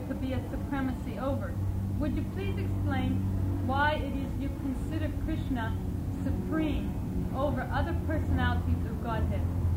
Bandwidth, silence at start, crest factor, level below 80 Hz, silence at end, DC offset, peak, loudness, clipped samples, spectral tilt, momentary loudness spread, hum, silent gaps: 16 kHz; 0 s; 16 dB; -38 dBFS; 0 s; under 0.1%; -14 dBFS; -31 LUFS; under 0.1%; -8 dB/octave; 5 LU; none; none